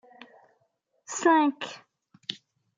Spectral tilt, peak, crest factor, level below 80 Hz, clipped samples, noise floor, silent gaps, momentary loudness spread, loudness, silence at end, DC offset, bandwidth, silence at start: -2 dB/octave; -10 dBFS; 20 dB; under -90 dBFS; under 0.1%; -73 dBFS; none; 22 LU; -27 LUFS; 0.45 s; under 0.1%; 9.6 kHz; 1.1 s